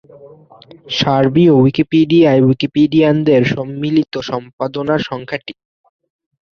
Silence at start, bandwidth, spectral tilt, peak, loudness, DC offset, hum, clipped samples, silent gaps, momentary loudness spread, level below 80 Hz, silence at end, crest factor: 0.25 s; 6.8 kHz; -7.5 dB/octave; 0 dBFS; -14 LUFS; under 0.1%; none; under 0.1%; 4.53-4.58 s; 13 LU; -50 dBFS; 1.05 s; 14 dB